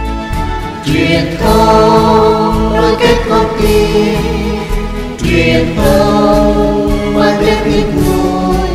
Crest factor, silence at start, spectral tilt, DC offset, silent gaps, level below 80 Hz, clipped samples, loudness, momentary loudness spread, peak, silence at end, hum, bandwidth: 10 dB; 0 s; -6 dB/octave; under 0.1%; none; -20 dBFS; 0.2%; -11 LUFS; 10 LU; 0 dBFS; 0 s; none; 16 kHz